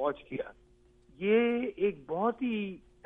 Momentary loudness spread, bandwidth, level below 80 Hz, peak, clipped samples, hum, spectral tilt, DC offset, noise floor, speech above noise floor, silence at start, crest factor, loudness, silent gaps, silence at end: 13 LU; 3.8 kHz; -64 dBFS; -16 dBFS; under 0.1%; none; -8.5 dB/octave; under 0.1%; -62 dBFS; 31 dB; 0 s; 16 dB; -31 LUFS; none; 0.3 s